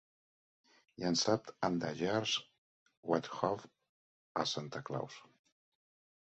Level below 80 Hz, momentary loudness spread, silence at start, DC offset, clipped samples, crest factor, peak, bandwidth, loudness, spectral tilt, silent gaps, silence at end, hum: -74 dBFS; 10 LU; 1 s; under 0.1%; under 0.1%; 24 dB; -16 dBFS; 8 kHz; -37 LUFS; -3.5 dB/octave; 2.58-2.86 s, 2.97-3.03 s, 3.89-4.35 s; 1.1 s; none